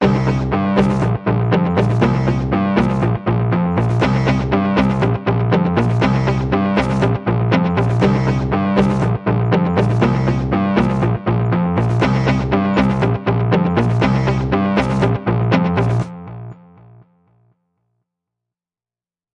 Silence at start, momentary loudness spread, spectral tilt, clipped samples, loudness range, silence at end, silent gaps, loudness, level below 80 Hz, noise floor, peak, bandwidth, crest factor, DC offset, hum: 0 s; 2 LU; -8.5 dB/octave; under 0.1%; 3 LU; 2.8 s; none; -16 LUFS; -34 dBFS; under -90 dBFS; 0 dBFS; 8.2 kHz; 16 dB; under 0.1%; none